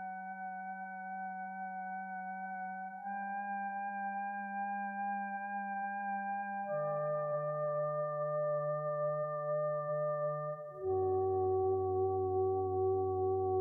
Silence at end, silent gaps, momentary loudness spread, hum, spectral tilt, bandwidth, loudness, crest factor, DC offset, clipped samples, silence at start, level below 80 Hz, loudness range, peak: 0 s; none; 9 LU; none; -12 dB/octave; 2.6 kHz; -37 LUFS; 12 dB; under 0.1%; under 0.1%; 0 s; -76 dBFS; 7 LU; -24 dBFS